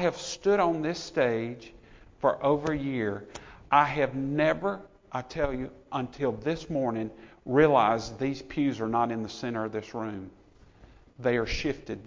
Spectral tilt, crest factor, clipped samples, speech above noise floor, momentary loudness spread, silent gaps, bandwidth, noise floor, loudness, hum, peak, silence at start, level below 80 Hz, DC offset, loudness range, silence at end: -6 dB/octave; 22 dB; under 0.1%; 27 dB; 14 LU; none; 7.6 kHz; -55 dBFS; -28 LUFS; none; -6 dBFS; 0 s; -52 dBFS; under 0.1%; 4 LU; 0 s